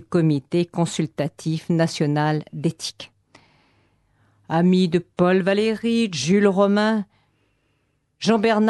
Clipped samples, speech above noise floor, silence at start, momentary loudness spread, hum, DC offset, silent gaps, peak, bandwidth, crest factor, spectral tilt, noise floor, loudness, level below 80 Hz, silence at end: under 0.1%; 48 dB; 0 s; 9 LU; none; under 0.1%; none; -4 dBFS; 12 kHz; 16 dB; -6 dB/octave; -68 dBFS; -21 LUFS; -62 dBFS; 0 s